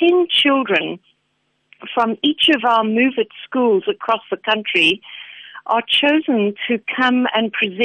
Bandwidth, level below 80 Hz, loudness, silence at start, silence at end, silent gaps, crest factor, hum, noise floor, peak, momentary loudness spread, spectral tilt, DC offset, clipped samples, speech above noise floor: 10 kHz; -66 dBFS; -17 LUFS; 0 s; 0 s; none; 14 dB; none; -67 dBFS; -4 dBFS; 11 LU; -4.5 dB/octave; under 0.1%; under 0.1%; 50 dB